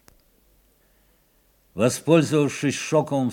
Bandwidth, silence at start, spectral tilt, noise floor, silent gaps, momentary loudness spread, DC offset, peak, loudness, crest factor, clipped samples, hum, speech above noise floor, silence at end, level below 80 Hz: 18 kHz; 1.75 s; -5.5 dB/octave; -62 dBFS; none; 6 LU; under 0.1%; -4 dBFS; -21 LUFS; 20 dB; under 0.1%; none; 41 dB; 0 s; -64 dBFS